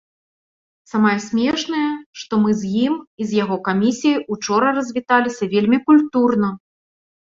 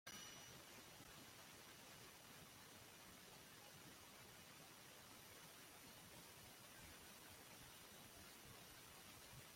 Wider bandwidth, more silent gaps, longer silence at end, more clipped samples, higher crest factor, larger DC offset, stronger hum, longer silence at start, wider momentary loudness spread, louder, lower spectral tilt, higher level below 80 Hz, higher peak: second, 7.6 kHz vs 16.5 kHz; first, 2.06-2.13 s, 3.07-3.18 s vs none; first, 0.75 s vs 0 s; neither; second, 18 dB vs 24 dB; neither; neither; first, 0.95 s vs 0.05 s; first, 8 LU vs 1 LU; first, -18 LUFS vs -60 LUFS; first, -5.5 dB/octave vs -2 dB/octave; first, -60 dBFS vs -80 dBFS; first, -2 dBFS vs -38 dBFS